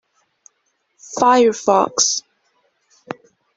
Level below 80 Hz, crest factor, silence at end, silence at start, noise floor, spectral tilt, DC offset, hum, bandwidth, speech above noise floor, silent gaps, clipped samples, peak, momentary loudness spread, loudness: -64 dBFS; 18 dB; 1.35 s; 1.1 s; -68 dBFS; -2 dB/octave; under 0.1%; none; 8 kHz; 53 dB; none; under 0.1%; -2 dBFS; 21 LU; -15 LUFS